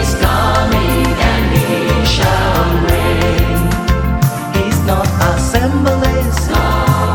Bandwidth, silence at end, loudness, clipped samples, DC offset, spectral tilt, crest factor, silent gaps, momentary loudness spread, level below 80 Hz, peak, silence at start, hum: 17.5 kHz; 0 s; -13 LUFS; under 0.1%; under 0.1%; -5.5 dB/octave; 12 dB; none; 3 LU; -18 dBFS; 0 dBFS; 0 s; none